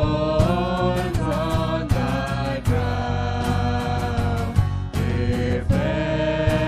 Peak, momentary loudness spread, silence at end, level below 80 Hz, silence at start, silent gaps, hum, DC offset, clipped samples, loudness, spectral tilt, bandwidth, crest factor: -4 dBFS; 3 LU; 0 s; -32 dBFS; 0 s; none; none; under 0.1%; under 0.1%; -23 LUFS; -7 dB/octave; 14.5 kHz; 16 dB